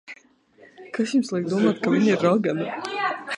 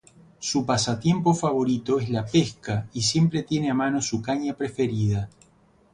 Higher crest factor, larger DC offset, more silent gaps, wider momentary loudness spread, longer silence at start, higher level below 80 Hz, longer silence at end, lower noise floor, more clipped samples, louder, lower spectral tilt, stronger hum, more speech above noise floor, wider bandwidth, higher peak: about the same, 18 dB vs 16 dB; neither; neither; about the same, 9 LU vs 7 LU; second, 0.1 s vs 0.4 s; second, -70 dBFS vs -52 dBFS; second, 0 s vs 0.65 s; second, -55 dBFS vs -59 dBFS; neither; about the same, -23 LUFS vs -24 LUFS; about the same, -6 dB/octave vs -5.5 dB/octave; neither; about the same, 33 dB vs 35 dB; about the same, 10.5 kHz vs 11 kHz; about the same, -6 dBFS vs -8 dBFS